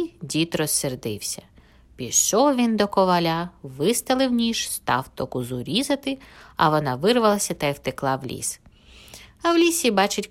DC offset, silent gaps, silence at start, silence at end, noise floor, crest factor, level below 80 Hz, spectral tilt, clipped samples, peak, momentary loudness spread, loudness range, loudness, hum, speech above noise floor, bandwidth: under 0.1%; none; 0 s; 0.05 s; -48 dBFS; 18 dB; -54 dBFS; -3.5 dB/octave; under 0.1%; -4 dBFS; 11 LU; 3 LU; -22 LUFS; none; 25 dB; 16 kHz